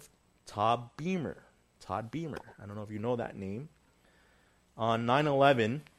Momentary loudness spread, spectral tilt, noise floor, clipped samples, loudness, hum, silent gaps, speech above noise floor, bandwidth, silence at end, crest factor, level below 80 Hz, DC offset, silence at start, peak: 19 LU; -6.5 dB/octave; -66 dBFS; under 0.1%; -32 LUFS; none; none; 35 dB; 13 kHz; 0.15 s; 24 dB; -66 dBFS; under 0.1%; 0 s; -10 dBFS